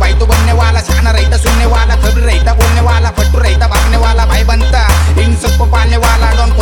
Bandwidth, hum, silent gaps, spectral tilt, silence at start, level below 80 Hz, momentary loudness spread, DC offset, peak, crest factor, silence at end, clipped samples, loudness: 18 kHz; none; none; -5 dB/octave; 0 s; -10 dBFS; 1 LU; under 0.1%; 0 dBFS; 8 dB; 0 s; 0.1%; -10 LUFS